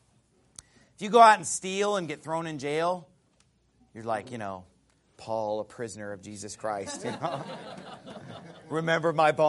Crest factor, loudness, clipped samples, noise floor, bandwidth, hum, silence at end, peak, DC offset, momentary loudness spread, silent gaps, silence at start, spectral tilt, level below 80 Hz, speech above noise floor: 24 dB; -27 LUFS; under 0.1%; -67 dBFS; 11.5 kHz; none; 0 s; -4 dBFS; under 0.1%; 22 LU; none; 1 s; -4 dB/octave; -72 dBFS; 39 dB